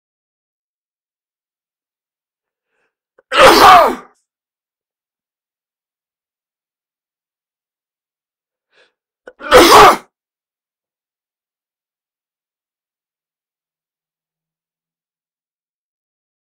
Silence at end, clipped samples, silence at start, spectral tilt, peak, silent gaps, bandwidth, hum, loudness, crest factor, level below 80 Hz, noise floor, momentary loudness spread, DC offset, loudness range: 6.55 s; 0.3%; 3.3 s; -2.5 dB/octave; 0 dBFS; none; 16 kHz; none; -7 LUFS; 18 dB; -42 dBFS; under -90 dBFS; 14 LU; under 0.1%; 5 LU